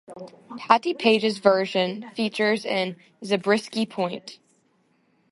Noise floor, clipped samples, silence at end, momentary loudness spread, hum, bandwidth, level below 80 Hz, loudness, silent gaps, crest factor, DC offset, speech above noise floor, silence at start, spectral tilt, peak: -66 dBFS; under 0.1%; 1 s; 19 LU; none; 11.5 kHz; -72 dBFS; -23 LUFS; none; 24 dB; under 0.1%; 42 dB; 0.1 s; -5 dB/octave; 0 dBFS